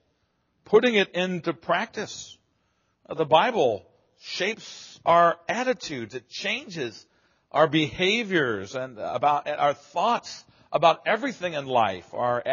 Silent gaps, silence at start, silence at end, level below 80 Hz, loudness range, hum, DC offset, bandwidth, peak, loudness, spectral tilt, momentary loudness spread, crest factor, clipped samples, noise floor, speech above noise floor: none; 0.7 s; 0 s; -66 dBFS; 2 LU; none; under 0.1%; 7.2 kHz; -4 dBFS; -25 LUFS; -2.5 dB/octave; 15 LU; 20 dB; under 0.1%; -71 dBFS; 47 dB